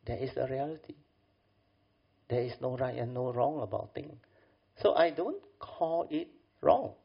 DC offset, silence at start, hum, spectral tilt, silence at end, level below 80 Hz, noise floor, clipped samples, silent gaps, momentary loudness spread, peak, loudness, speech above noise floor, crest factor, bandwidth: under 0.1%; 0.05 s; none; -5.5 dB/octave; 0.1 s; -62 dBFS; -72 dBFS; under 0.1%; none; 17 LU; -10 dBFS; -33 LUFS; 39 dB; 24 dB; 5.4 kHz